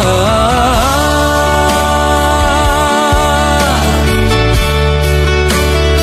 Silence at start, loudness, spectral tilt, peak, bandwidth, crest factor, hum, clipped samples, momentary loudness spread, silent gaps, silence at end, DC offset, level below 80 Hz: 0 s; -11 LUFS; -4.5 dB/octave; 0 dBFS; 15.5 kHz; 10 dB; none; under 0.1%; 1 LU; none; 0 s; under 0.1%; -16 dBFS